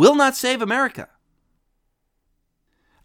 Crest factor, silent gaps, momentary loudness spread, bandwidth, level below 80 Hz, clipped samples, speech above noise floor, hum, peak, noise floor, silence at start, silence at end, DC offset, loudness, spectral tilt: 22 dB; none; 10 LU; 19 kHz; -66 dBFS; under 0.1%; 54 dB; none; 0 dBFS; -71 dBFS; 0 s; 2 s; under 0.1%; -19 LUFS; -3.5 dB/octave